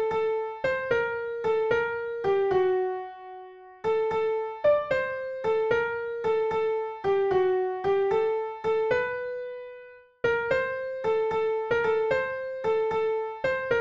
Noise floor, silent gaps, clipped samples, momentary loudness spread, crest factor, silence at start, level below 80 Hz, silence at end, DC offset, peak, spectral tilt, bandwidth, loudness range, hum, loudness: -48 dBFS; none; under 0.1%; 8 LU; 14 dB; 0 s; -60 dBFS; 0 s; under 0.1%; -12 dBFS; -6.5 dB/octave; 7.4 kHz; 2 LU; none; -27 LUFS